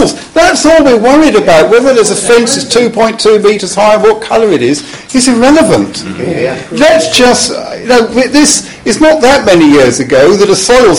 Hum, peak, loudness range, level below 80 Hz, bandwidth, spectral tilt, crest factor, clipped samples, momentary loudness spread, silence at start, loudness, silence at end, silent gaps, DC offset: none; 0 dBFS; 2 LU; -34 dBFS; 16.5 kHz; -3.5 dB/octave; 6 dB; 3%; 8 LU; 0 s; -6 LUFS; 0 s; none; 0.9%